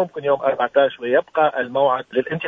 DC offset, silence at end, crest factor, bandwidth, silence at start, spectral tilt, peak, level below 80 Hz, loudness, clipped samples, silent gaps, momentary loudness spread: under 0.1%; 0 s; 16 dB; 3.9 kHz; 0 s; -7.5 dB/octave; -4 dBFS; -66 dBFS; -19 LUFS; under 0.1%; none; 3 LU